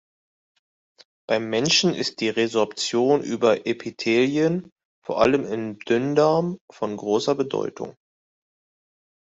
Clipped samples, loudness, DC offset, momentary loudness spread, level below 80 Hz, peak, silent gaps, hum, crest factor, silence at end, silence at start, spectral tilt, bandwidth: under 0.1%; -22 LUFS; under 0.1%; 11 LU; -64 dBFS; -4 dBFS; 4.72-4.76 s, 4.85-5.02 s, 6.61-6.68 s; none; 20 dB; 1.45 s; 1.3 s; -4.5 dB/octave; 8.2 kHz